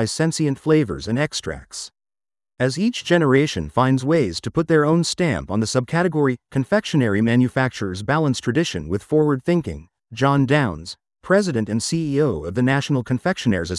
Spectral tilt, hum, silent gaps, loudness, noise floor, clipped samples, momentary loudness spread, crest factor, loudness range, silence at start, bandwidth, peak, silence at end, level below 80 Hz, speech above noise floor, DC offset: -6 dB/octave; none; none; -20 LUFS; under -90 dBFS; under 0.1%; 9 LU; 18 dB; 2 LU; 0 s; 12 kHz; -2 dBFS; 0 s; -48 dBFS; over 70 dB; under 0.1%